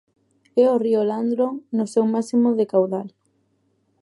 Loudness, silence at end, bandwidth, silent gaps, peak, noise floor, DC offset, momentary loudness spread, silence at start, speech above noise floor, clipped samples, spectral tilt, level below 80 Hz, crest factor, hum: -21 LUFS; 0.95 s; 11.5 kHz; none; -6 dBFS; -67 dBFS; under 0.1%; 7 LU; 0.55 s; 47 dB; under 0.1%; -7.5 dB/octave; -78 dBFS; 16 dB; none